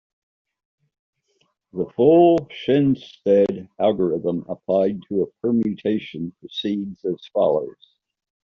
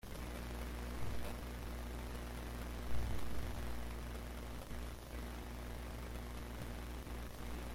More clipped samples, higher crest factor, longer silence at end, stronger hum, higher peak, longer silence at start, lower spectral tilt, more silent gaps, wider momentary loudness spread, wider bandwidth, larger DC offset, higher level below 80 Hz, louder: neither; about the same, 18 dB vs 16 dB; first, 0.75 s vs 0 s; second, none vs 60 Hz at -45 dBFS; first, -4 dBFS vs -26 dBFS; first, 1.75 s vs 0.05 s; about the same, -6.5 dB/octave vs -5.5 dB/octave; neither; first, 13 LU vs 3 LU; second, 6.4 kHz vs 16.5 kHz; neither; second, -62 dBFS vs -48 dBFS; first, -21 LUFS vs -47 LUFS